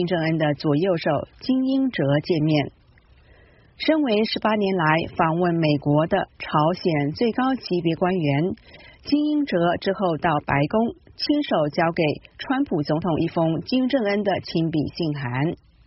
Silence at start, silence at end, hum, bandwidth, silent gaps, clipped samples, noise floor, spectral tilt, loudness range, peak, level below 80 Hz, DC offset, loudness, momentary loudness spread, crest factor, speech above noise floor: 0 s; 0.3 s; none; 6 kHz; none; under 0.1%; -54 dBFS; -5.5 dB/octave; 2 LU; -4 dBFS; -52 dBFS; under 0.1%; -22 LUFS; 5 LU; 18 dB; 32 dB